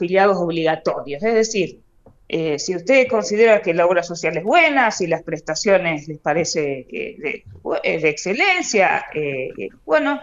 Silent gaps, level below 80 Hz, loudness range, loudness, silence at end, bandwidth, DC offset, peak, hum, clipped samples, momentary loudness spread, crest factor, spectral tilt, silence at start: none; -56 dBFS; 4 LU; -18 LUFS; 0 s; 8 kHz; under 0.1%; -2 dBFS; none; under 0.1%; 12 LU; 16 dB; -4 dB/octave; 0 s